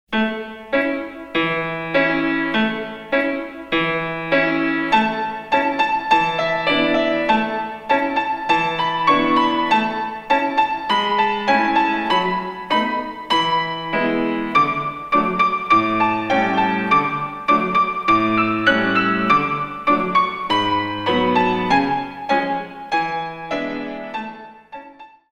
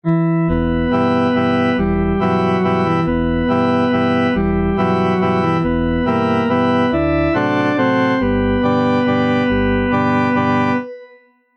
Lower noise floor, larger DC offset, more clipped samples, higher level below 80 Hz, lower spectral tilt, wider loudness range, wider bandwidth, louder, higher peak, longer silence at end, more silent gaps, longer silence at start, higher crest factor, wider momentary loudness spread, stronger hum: second, -43 dBFS vs -48 dBFS; neither; neither; second, -50 dBFS vs -32 dBFS; second, -5.5 dB/octave vs -8.5 dB/octave; about the same, 3 LU vs 1 LU; first, 10.5 kHz vs 6.2 kHz; second, -19 LUFS vs -16 LUFS; first, -2 dBFS vs -6 dBFS; second, 0.25 s vs 0.5 s; neither; about the same, 0.1 s vs 0.05 s; first, 18 dB vs 10 dB; first, 8 LU vs 2 LU; neither